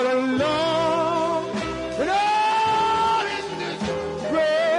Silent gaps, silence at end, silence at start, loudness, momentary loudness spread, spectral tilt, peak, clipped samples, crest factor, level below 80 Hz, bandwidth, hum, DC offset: none; 0 s; 0 s; -22 LUFS; 8 LU; -4.5 dB/octave; -10 dBFS; under 0.1%; 12 dB; -52 dBFS; 11 kHz; none; under 0.1%